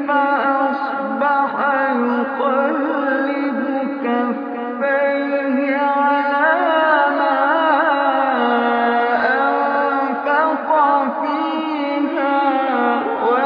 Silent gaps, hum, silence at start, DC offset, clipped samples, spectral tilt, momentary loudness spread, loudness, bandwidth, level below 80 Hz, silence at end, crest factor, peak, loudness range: none; none; 0 s; under 0.1%; under 0.1%; -7 dB/octave; 5 LU; -17 LUFS; 5.2 kHz; -74 dBFS; 0 s; 16 dB; -2 dBFS; 4 LU